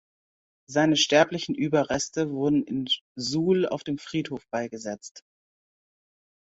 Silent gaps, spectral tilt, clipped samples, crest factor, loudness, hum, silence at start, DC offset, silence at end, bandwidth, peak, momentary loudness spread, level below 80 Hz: 3.01-3.15 s, 5.11-5.15 s; -4 dB/octave; under 0.1%; 22 dB; -25 LUFS; none; 0.7 s; under 0.1%; 1.3 s; 8 kHz; -6 dBFS; 12 LU; -64 dBFS